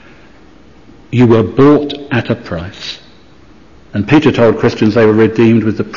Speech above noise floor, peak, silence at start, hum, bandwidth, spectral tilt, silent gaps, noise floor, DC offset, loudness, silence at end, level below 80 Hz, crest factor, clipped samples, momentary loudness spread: 32 dB; 0 dBFS; 1.1 s; none; 7.4 kHz; -8 dB/octave; none; -42 dBFS; under 0.1%; -11 LUFS; 0 s; -42 dBFS; 12 dB; under 0.1%; 15 LU